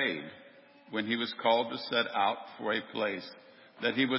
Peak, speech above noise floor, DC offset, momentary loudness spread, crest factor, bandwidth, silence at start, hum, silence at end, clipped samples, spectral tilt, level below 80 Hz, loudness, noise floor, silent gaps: -12 dBFS; 25 dB; under 0.1%; 12 LU; 20 dB; 5.8 kHz; 0 s; none; 0 s; under 0.1%; -8 dB/octave; -80 dBFS; -32 LUFS; -56 dBFS; none